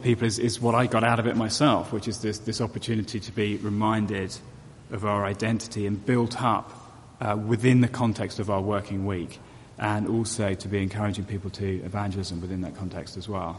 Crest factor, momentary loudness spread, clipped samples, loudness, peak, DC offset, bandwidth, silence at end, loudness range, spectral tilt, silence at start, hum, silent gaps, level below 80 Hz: 20 dB; 11 LU; under 0.1%; -27 LUFS; -6 dBFS; under 0.1%; 11.5 kHz; 0 s; 4 LU; -6 dB/octave; 0 s; none; none; -54 dBFS